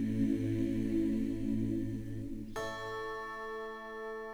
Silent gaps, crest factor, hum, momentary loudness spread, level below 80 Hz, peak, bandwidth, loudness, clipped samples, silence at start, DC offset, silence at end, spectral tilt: none; 14 dB; none; 10 LU; -50 dBFS; -20 dBFS; over 20 kHz; -36 LUFS; under 0.1%; 0 s; under 0.1%; 0 s; -7.5 dB/octave